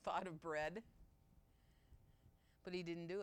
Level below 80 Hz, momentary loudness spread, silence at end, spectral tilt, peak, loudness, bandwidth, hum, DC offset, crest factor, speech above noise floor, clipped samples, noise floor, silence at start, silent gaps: -72 dBFS; 10 LU; 0 s; -5.5 dB/octave; -30 dBFS; -47 LUFS; 16.5 kHz; none; under 0.1%; 18 dB; 25 dB; under 0.1%; -73 dBFS; 0.05 s; none